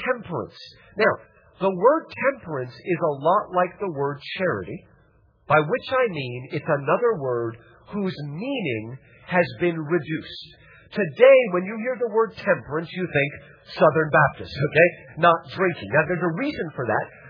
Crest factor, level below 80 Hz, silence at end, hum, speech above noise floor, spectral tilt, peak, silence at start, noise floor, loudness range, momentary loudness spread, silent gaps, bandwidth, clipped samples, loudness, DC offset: 22 dB; -58 dBFS; 0 s; none; 36 dB; -8.5 dB/octave; -2 dBFS; 0 s; -58 dBFS; 6 LU; 13 LU; none; 5.2 kHz; under 0.1%; -23 LUFS; under 0.1%